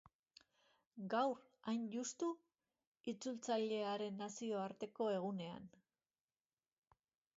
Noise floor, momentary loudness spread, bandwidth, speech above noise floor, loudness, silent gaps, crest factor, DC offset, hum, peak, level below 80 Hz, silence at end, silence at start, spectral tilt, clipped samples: under -90 dBFS; 13 LU; 7.6 kHz; over 47 dB; -44 LUFS; 2.87-2.92 s, 3.00-3.04 s; 18 dB; under 0.1%; none; -26 dBFS; -88 dBFS; 1.7 s; 0.95 s; -4.5 dB/octave; under 0.1%